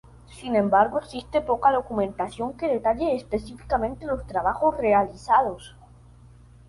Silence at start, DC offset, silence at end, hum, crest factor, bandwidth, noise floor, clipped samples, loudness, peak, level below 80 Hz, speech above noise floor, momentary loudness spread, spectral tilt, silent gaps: 0.3 s; under 0.1%; 1 s; 60 Hz at -45 dBFS; 18 dB; 11.5 kHz; -50 dBFS; under 0.1%; -24 LUFS; -6 dBFS; -46 dBFS; 26 dB; 10 LU; -6.5 dB/octave; none